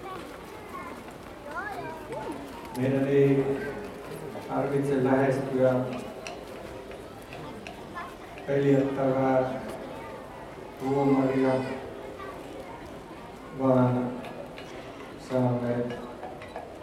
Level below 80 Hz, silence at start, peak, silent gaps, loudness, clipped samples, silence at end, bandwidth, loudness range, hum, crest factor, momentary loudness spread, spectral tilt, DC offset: -56 dBFS; 0 s; -10 dBFS; none; -28 LUFS; under 0.1%; 0 s; 15 kHz; 4 LU; none; 18 dB; 18 LU; -7.5 dB/octave; under 0.1%